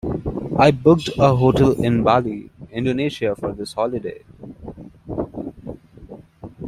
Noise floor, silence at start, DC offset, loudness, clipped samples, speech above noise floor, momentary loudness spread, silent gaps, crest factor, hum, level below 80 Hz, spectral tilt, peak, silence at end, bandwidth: -41 dBFS; 0.05 s; under 0.1%; -19 LUFS; under 0.1%; 24 dB; 22 LU; none; 20 dB; none; -42 dBFS; -7.5 dB/octave; 0 dBFS; 0 s; 14 kHz